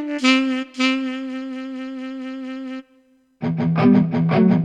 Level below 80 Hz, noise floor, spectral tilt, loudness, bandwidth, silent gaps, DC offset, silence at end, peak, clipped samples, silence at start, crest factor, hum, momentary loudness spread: -58 dBFS; -57 dBFS; -6.5 dB/octave; -20 LUFS; 9.6 kHz; none; under 0.1%; 0 s; -2 dBFS; under 0.1%; 0 s; 20 dB; none; 15 LU